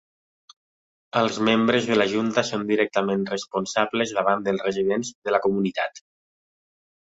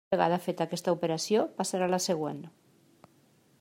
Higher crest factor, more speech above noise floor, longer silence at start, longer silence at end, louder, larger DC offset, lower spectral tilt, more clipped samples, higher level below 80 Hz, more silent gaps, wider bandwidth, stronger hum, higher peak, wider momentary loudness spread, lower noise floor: about the same, 20 dB vs 20 dB; first, over 67 dB vs 35 dB; first, 1.15 s vs 0.1 s; about the same, 1.15 s vs 1.1 s; first, -23 LUFS vs -30 LUFS; neither; about the same, -4.5 dB/octave vs -4.5 dB/octave; neither; first, -64 dBFS vs -76 dBFS; first, 5.15-5.22 s vs none; second, 8 kHz vs 16 kHz; neither; first, -4 dBFS vs -10 dBFS; about the same, 7 LU vs 8 LU; first, under -90 dBFS vs -64 dBFS